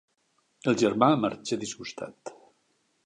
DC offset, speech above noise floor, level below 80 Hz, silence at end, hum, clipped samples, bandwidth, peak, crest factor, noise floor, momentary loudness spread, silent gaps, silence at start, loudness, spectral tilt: under 0.1%; 45 dB; -70 dBFS; 0.75 s; none; under 0.1%; 10.5 kHz; -6 dBFS; 22 dB; -72 dBFS; 19 LU; none; 0.65 s; -27 LUFS; -5 dB/octave